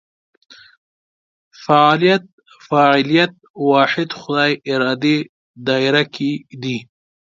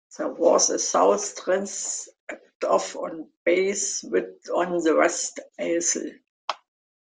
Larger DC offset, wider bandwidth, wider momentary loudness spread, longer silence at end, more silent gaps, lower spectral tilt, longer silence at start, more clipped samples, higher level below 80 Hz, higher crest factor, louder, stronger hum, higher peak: neither; second, 7.6 kHz vs 10 kHz; about the same, 12 LU vs 14 LU; second, 0.4 s vs 0.65 s; second, 2.33-2.38 s, 3.50-3.54 s, 5.29-5.54 s vs 2.20-2.27 s, 2.55-2.60 s, 3.37-3.46 s, 6.29-6.48 s; first, -6 dB/octave vs -2 dB/octave; first, 1.6 s vs 0.1 s; neither; first, -66 dBFS vs -72 dBFS; about the same, 18 dB vs 20 dB; first, -16 LUFS vs -24 LUFS; neither; first, 0 dBFS vs -6 dBFS